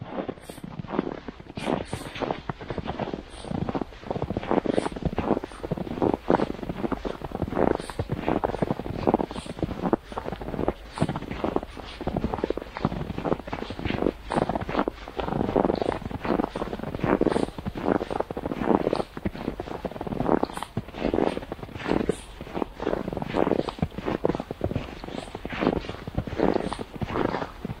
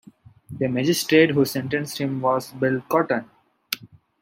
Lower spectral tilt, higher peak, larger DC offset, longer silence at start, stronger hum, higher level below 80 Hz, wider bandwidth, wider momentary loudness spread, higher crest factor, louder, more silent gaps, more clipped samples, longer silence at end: first, -7 dB/octave vs -5 dB/octave; about the same, -2 dBFS vs -2 dBFS; neither; second, 0 s vs 0.5 s; neither; first, -44 dBFS vs -64 dBFS; about the same, 16 kHz vs 16.5 kHz; second, 9 LU vs 14 LU; first, 26 dB vs 20 dB; second, -29 LUFS vs -22 LUFS; neither; neither; second, 0 s vs 0.35 s